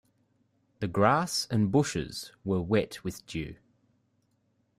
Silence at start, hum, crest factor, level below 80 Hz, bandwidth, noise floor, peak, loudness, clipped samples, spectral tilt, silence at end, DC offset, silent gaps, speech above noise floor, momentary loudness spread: 0.8 s; none; 22 dB; -58 dBFS; 16 kHz; -72 dBFS; -10 dBFS; -29 LUFS; under 0.1%; -5.5 dB/octave; 1.25 s; under 0.1%; none; 44 dB; 13 LU